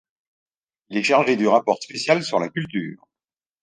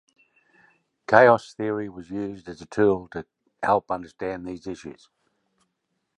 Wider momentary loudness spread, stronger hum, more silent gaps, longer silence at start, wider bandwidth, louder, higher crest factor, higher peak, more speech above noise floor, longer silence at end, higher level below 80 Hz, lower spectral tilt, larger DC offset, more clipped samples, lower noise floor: second, 11 LU vs 21 LU; neither; neither; second, 0.9 s vs 1.1 s; about the same, 10 kHz vs 9.6 kHz; about the same, -21 LUFS vs -23 LUFS; about the same, 20 dB vs 24 dB; second, -4 dBFS vs 0 dBFS; first, over 69 dB vs 54 dB; second, 0.65 s vs 1.25 s; second, -68 dBFS vs -58 dBFS; second, -5 dB/octave vs -6.5 dB/octave; neither; neither; first, under -90 dBFS vs -77 dBFS